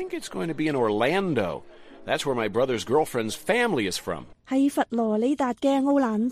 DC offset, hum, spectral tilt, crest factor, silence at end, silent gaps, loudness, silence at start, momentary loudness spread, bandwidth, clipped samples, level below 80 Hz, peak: under 0.1%; none; -5 dB/octave; 16 dB; 0 s; none; -25 LUFS; 0 s; 8 LU; 15 kHz; under 0.1%; -56 dBFS; -8 dBFS